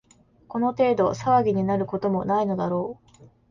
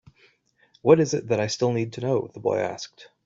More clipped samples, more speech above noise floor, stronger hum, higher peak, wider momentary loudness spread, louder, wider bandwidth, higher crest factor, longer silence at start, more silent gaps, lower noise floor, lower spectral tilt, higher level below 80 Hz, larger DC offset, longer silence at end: neither; second, 27 dB vs 39 dB; neither; second, -8 dBFS vs -4 dBFS; second, 7 LU vs 11 LU; about the same, -24 LUFS vs -24 LUFS; about the same, 7.4 kHz vs 7.8 kHz; second, 16 dB vs 22 dB; second, 0.5 s vs 0.85 s; neither; second, -50 dBFS vs -63 dBFS; first, -8 dB/octave vs -5.5 dB/octave; first, -56 dBFS vs -64 dBFS; neither; about the same, 0.25 s vs 0.2 s